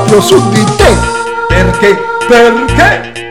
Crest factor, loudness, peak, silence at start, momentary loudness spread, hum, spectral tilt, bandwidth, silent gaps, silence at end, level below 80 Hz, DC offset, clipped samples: 8 dB; -7 LUFS; 0 dBFS; 0 s; 6 LU; none; -5 dB/octave; 16.5 kHz; none; 0 s; -20 dBFS; 1%; 3%